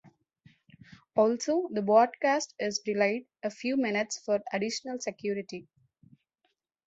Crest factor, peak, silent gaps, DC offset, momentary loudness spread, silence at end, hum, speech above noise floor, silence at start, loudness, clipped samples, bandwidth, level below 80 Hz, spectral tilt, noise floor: 22 dB; -10 dBFS; none; under 0.1%; 11 LU; 1.25 s; none; 49 dB; 1.15 s; -29 LUFS; under 0.1%; 8 kHz; -76 dBFS; -4 dB/octave; -78 dBFS